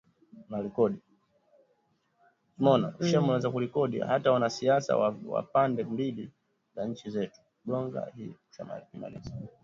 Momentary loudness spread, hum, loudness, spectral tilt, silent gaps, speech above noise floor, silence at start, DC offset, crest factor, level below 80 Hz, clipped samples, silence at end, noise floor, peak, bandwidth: 17 LU; none; -29 LUFS; -6.5 dB/octave; none; 43 dB; 0.35 s; under 0.1%; 20 dB; -66 dBFS; under 0.1%; 0.15 s; -72 dBFS; -10 dBFS; 7.6 kHz